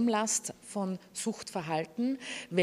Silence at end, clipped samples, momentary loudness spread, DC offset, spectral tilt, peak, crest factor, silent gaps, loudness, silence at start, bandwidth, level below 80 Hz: 0 s; under 0.1%; 8 LU; under 0.1%; -3.5 dB/octave; -14 dBFS; 20 dB; none; -34 LUFS; 0 s; 15.5 kHz; -74 dBFS